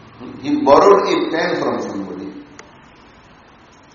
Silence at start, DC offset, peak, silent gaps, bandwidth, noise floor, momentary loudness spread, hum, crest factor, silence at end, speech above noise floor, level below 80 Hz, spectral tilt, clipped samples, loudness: 0.2 s; under 0.1%; 0 dBFS; none; 7.2 kHz; -46 dBFS; 22 LU; none; 18 dB; 1.5 s; 31 dB; -52 dBFS; -3.5 dB/octave; under 0.1%; -15 LUFS